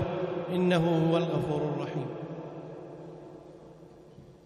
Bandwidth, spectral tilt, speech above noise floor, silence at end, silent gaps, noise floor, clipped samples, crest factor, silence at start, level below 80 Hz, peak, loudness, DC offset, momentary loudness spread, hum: 11 kHz; -8 dB/octave; 24 dB; 0.1 s; none; -52 dBFS; under 0.1%; 16 dB; 0 s; -60 dBFS; -16 dBFS; -29 LUFS; under 0.1%; 23 LU; none